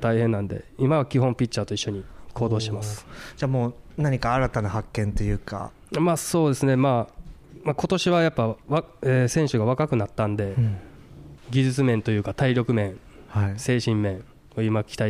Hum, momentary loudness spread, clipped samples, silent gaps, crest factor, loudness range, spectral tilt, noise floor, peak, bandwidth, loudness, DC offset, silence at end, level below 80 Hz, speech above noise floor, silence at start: none; 10 LU; under 0.1%; none; 14 dB; 3 LU; -6.5 dB/octave; -44 dBFS; -10 dBFS; 15 kHz; -24 LUFS; under 0.1%; 0 s; -42 dBFS; 21 dB; 0 s